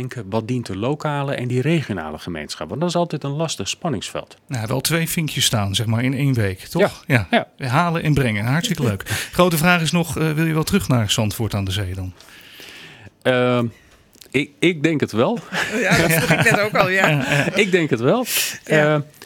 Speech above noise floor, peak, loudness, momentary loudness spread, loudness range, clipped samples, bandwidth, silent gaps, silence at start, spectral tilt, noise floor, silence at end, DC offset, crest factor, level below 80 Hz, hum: 29 dB; -2 dBFS; -19 LUFS; 11 LU; 6 LU; under 0.1%; 19 kHz; none; 0 s; -4.5 dB/octave; -48 dBFS; 0 s; under 0.1%; 18 dB; -48 dBFS; none